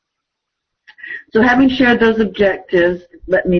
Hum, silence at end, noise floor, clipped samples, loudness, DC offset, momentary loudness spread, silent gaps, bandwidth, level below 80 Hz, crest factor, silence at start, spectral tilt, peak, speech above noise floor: none; 0 s; -78 dBFS; under 0.1%; -14 LUFS; under 0.1%; 13 LU; none; 6.4 kHz; -42 dBFS; 12 dB; 1.05 s; -7 dB/octave; -2 dBFS; 64 dB